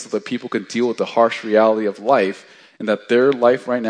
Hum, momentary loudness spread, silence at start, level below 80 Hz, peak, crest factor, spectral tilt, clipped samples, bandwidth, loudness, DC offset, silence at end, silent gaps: none; 9 LU; 0 s; -76 dBFS; 0 dBFS; 18 dB; -5.5 dB/octave; under 0.1%; 10 kHz; -18 LUFS; under 0.1%; 0 s; none